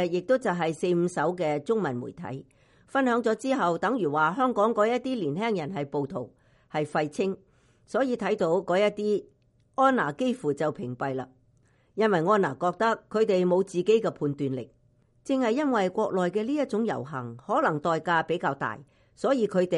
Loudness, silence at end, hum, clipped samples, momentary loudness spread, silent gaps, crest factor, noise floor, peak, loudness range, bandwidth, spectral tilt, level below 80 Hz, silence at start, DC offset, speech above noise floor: -27 LUFS; 0 s; none; under 0.1%; 11 LU; none; 18 dB; -64 dBFS; -10 dBFS; 3 LU; 11.5 kHz; -6.5 dB/octave; -68 dBFS; 0 s; under 0.1%; 38 dB